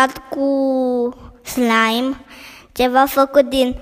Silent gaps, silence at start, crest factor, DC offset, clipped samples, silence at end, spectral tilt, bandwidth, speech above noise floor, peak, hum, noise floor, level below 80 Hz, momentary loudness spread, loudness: none; 0 s; 18 dB; under 0.1%; under 0.1%; 0 s; -3.5 dB/octave; 15.5 kHz; 23 dB; 0 dBFS; none; -39 dBFS; -44 dBFS; 18 LU; -17 LUFS